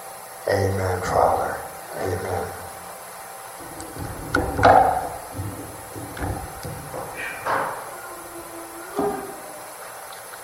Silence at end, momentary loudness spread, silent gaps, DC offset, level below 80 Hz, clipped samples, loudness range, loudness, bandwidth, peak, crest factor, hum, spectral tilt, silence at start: 0 s; 16 LU; none; under 0.1%; -44 dBFS; under 0.1%; 7 LU; -25 LUFS; 16 kHz; -2 dBFS; 24 dB; none; -5 dB/octave; 0 s